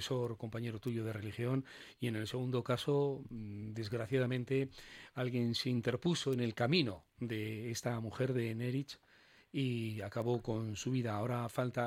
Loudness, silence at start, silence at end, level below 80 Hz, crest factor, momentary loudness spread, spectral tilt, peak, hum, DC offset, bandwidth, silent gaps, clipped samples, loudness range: -38 LUFS; 0 s; 0 s; -68 dBFS; 20 dB; 9 LU; -6 dB/octave; -18 dBFS; none; under 0.1%; 16 kHz; none; under 0.1%; 3 LU